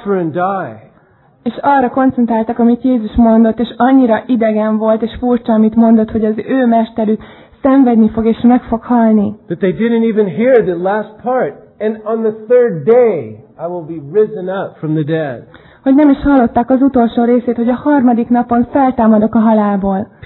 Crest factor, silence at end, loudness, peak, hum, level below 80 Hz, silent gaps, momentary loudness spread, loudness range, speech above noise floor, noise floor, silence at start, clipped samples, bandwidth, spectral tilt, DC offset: 12 dB; 0.2 s; -12 LUFS; 0 dBFS; none; -40 dBFS; none; 10 LU; 3 LU; 37 dB; -48 dBFS; 0 s; under 0.1%; 4.2 kHz; -11.5 dB/octave; under 0.1%